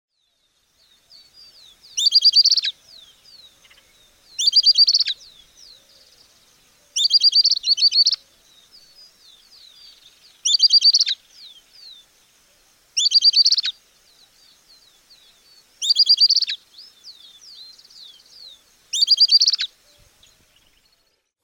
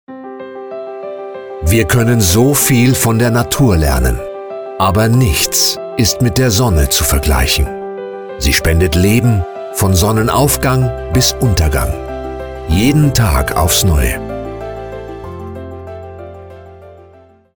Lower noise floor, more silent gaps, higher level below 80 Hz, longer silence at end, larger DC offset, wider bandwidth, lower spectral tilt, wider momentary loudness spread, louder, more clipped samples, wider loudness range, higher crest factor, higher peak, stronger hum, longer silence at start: first, -67 dBFS vs -43 dBFS; neither; second, -70 dBFS vs -22 dBFS; first, 1.75 s vs 0.55 s; neither; second, 18 kHz vs over 20 kHz; second, 5.5 dB/octave vs -4.5 dB/octave; about the same, 15 LU vs 17 LU; about the same, -14 LUFS vs -12 LUFS; neither; about the same, 3 LU vs 4 LU; about the same, 16 dB vs 14 dB; second, -6 dBFS vs 0 dBFS; neither; first, 1.95 s vs 0.1 s